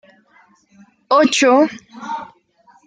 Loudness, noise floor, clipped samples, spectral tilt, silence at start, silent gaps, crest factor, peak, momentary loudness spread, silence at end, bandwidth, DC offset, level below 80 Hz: -14 LUFS; -54 dBFS; under 0.1%; -2.5 dB/octave; 1.1 s; none; 16 dB; -2 dBFS; 17 LU; 0.65 s; 9.6 kHz; under 0.1%; -70 dBFS